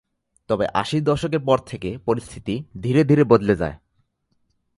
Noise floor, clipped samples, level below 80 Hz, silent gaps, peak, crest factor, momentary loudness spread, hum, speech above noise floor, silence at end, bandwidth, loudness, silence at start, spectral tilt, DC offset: -69 dBFS; under 0.1%; -48 dBFS; none; -2 dBFS; 20 dB; 13 LU; none; 49 dB; 1 s; 11.5 kHz; -21 LUFS; 0.5 s; -7.5 dB/octave; under 0.1%